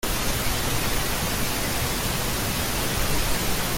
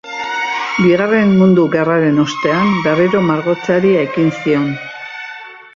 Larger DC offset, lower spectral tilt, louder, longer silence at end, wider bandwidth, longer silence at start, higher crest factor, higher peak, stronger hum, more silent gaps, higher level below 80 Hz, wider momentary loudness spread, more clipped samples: neither; second, -3 dB/octave vs -7 dB/octave; second, -25 LUFS vs -13 LUFS; second, 0 s vs 0.15 s; first, 17 kHz vs 7.4 kHz; about the same, 0.05 s vs 0.05 s; about the same, 14 dB vs 12 dB; second, -10 dBFS vs -2 dBFS; neither; neither; first, -32 dBFS vs -54 dBFS; second, 1 LU vs 15 LU; neither